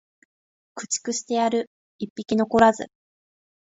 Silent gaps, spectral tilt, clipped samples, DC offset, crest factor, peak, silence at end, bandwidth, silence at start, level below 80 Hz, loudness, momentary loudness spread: 1.67-1.99 s, 2.10-2.16 s; -3.5 dB/octave; under 0.1%; under 0.1%; 22 dB; -2 dBFS; 0.75 s; 8 kHz; 0.75 s; -58 dBFS; -23 LUFS; 20 LU